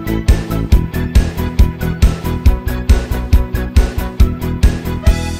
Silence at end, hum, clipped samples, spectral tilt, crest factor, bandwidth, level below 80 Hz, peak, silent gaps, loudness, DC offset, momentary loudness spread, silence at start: 0 s; none; under 0.1%; -6.5 dB/octave; 12 dB; 16 kHz; -14 dBFS; 0 dBFS; none; -16 LUFS; under 0.1%; 1 LU; 0 s